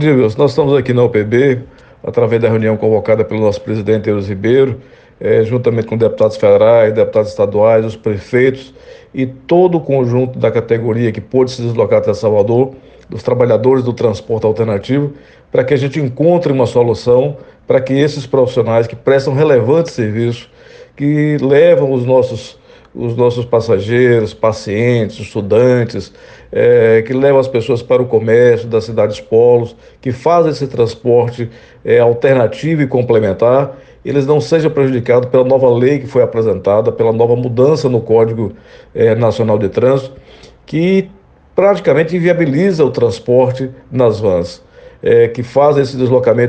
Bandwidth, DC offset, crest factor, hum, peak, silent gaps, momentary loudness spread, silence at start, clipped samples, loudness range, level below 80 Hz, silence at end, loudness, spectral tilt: 8.6 kHz; under 0.1%; 12 dB; none; 0 dBFS; none; 9 LU; 0 s; under 0.1%; 2 LU; -48 dBFS; 0 s; -12 LUFS; -8 dB/octave